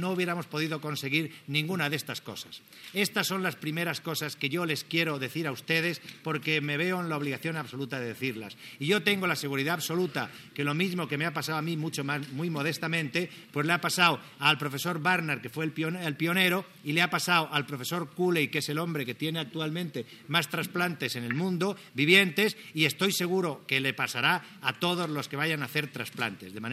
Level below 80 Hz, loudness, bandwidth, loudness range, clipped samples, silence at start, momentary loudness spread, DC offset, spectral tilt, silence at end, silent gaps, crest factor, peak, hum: -84 dBFS; -29 LUFS; 16 kHz; 5 LU; under 0.1%; 0 s; 9 LU; under 0.1%; -4 dB/octave; 0 s; none; 24 dB; -6 dBFS; none